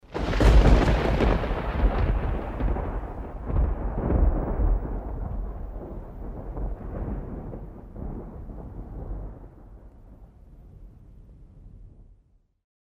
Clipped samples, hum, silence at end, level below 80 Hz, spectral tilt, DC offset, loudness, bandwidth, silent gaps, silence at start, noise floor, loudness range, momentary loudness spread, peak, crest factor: under 0.1%; none; 0.85 s; -28 dBFS; -7.5 dB/octave; under 0.1%; -27 LUFS; 7.8 kHz; none; 0.1 s; -61 dBFS; 19 LU; 19 LU; -6 dBFS; 20 dB